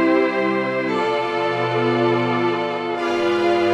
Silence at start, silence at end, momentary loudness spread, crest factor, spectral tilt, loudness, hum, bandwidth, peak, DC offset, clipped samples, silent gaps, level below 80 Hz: 0 s; 0 s; 4 LU; 14 dB; -6.5 dB/octave; -20 LUFS; none; 9 kHz; -6 dBFS; under 0.1%; under 0.1%; none; -66 dBFS